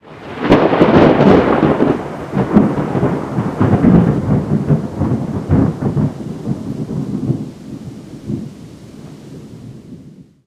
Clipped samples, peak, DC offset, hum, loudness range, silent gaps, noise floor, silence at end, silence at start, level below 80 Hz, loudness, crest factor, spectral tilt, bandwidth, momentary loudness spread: under 0.1%; 0 dBFS; under 0.1%; none; 13 LU; none; -39 dBFS; 0.25 s; 0.05 s; -36 dBFS; -14 LUFS; 14 dB; -8.5 dB/octave; 10.5 kHz; 24 LU